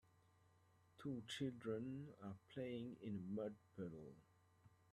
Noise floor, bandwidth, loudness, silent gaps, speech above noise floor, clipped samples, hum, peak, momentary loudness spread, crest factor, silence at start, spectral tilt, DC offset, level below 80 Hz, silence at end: -75 dBFS; 13 kHz; -51 LUFS; none; 25 dB; under 0.1%; none; -34 dBFS; 8 LU; 18 dB; 0.95 s; -6.5 dB/octave; under 0.1%; -82 dBFS; 0.15 s